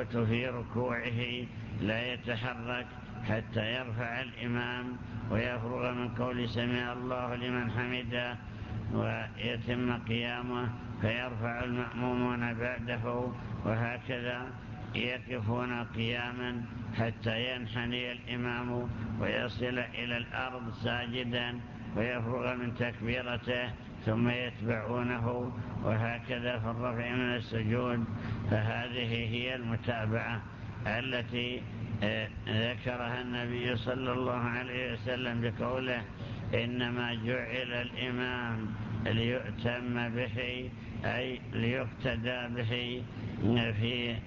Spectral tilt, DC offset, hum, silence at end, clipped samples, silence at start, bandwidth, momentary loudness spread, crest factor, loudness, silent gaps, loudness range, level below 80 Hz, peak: -7.5 dB/octave; under 0.1%; none; 0 s; under 0.1%; 0 s; 7 kHz; 5 LU; 16 dB; -34 LUFS; none; 2 LU; -52 dBFS; -18 dBFS